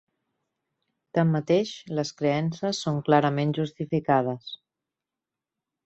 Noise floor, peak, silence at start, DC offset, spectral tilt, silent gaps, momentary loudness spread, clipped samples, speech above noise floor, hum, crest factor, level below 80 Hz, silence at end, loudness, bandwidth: -88 dBFS; -6 dBFS; 1.15 s; under 0.1%; -6.5 dB/octave; none; 9 LU; under 0.1%; 64 dB; none; 22 dB; -68 dBFS; 1.3 s; -26 LUFS; 8.2 kHz